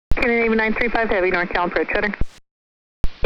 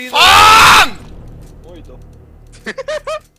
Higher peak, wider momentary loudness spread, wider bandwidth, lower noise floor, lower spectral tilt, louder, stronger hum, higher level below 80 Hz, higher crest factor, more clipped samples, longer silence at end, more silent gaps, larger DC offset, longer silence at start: second, -4 dBFS vs 0 dBFS; second, 14 LU vs 23 LU; second, 7.4 kHz vs 16 kHz; first, under -90 dBFS vs -39 dBFS; first, -7 dB/octave vs -1 dB/octave; second, -19 LUFS vs -5 LUFS; neither; about the same, -30 dBFS vs -34 dBFS; about the same, 14 dB vs 12 dB; neither; second, 0 s vs 0.2 s; first, 2.51-3.04 s vs none; neither; about the same, 0.1 s vs 0 s